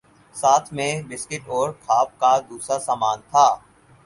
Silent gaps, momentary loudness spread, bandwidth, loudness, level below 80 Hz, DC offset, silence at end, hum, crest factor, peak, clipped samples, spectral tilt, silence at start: none; 12 LU; 11.5 kHz; -21 LUFS; -62 dBFS; under 0.1%; 0.45 s; none; 20 dB; -2 dBFS; under 0.1%; -3 dB/octave; 0.35 s